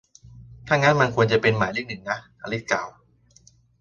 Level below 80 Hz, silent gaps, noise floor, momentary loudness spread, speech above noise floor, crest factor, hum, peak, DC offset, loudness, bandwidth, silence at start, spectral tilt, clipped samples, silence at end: -54 dBFS; none; -56 dBFS; 12 LU; 34 dB; 22 dB; none; -2 dBFS; under 0.1%; -22 LUFS; 7.4 kHz; 0.25 s; -5.5 dB/octave; under 0.1%; 0.9 s